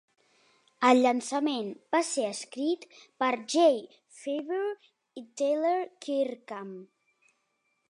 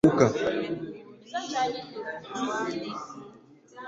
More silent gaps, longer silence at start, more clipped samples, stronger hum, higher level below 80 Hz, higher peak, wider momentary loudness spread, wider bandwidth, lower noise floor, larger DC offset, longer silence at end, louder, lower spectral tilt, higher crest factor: neither; first, 0.8 s vs 0.05 s; neither; neither; second, -86 dBFS vs -62 dBFS; second, -10 dBFS vs -6 dBFS; about the same, 18 LU vs 19 LU; about the same, 11.5 kHz vs 10.5 kHz; first, -76 dBFS vs -53 dBFS; neither; first, 1.05 s vs 0 s; about the same, -28 LUFS vs -30 LUFS; second, -3 dB/octave vs -5.5 dB/octave; about the same, 20 dB vs 24 dB